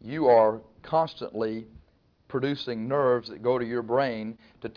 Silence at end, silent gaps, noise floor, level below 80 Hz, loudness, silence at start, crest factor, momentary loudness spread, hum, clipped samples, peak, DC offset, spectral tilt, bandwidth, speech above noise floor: 0.05 s; none; -62 dBFS; -62 dBFS; -26 LUFS; 0.05 s; 18 dB; 15 LU; none; under 0.1%; -10 dBFS; under 0.1%; -8 dB/octave; 5.4 kHz; 36 dB